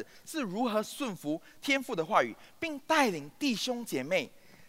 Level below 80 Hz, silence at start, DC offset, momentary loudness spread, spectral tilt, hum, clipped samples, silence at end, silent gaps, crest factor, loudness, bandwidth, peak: -72 dBFS; 0 s; under 0.1%; 10 LU; -3.5 dB/octave; none; under 0.1%; 0 s; none; 22 dB; -32 LUFS; 16 kHz; -12 dBFS